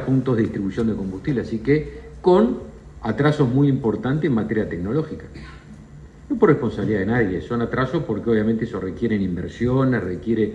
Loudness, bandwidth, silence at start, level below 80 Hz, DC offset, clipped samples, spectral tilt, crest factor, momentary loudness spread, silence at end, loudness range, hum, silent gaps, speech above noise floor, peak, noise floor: -21 LUFS; 9 kHz; 0 s; -44 dBFS; under 0.1%; under 0.1%; -9 dB/octave; 18 dB; 10 LU; 0 s; 2 LU; none; none; 21 dB; -2 dBFS; -42 dBFS